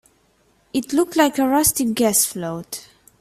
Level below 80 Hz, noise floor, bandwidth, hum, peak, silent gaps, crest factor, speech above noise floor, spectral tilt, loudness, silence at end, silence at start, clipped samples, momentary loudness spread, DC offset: -52 dBFS; -60 dBFS; 16 kHz; none; -2 dBFS; none; 20 dB; 41 dB; -3 dB/octave; -19 LUFS; 0.4 s; 0.75 s; under 0.1%; 13 LU; under 0.1%